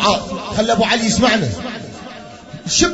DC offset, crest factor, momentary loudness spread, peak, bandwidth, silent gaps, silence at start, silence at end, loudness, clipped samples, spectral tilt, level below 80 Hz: under 0.1%; 16 dB; 19 LU; 0 dBFS; 8 kHz; none; 0 s; 0 s; -16 LUFS; under 0.1%; -3.5 dB/octave; -40 dBFS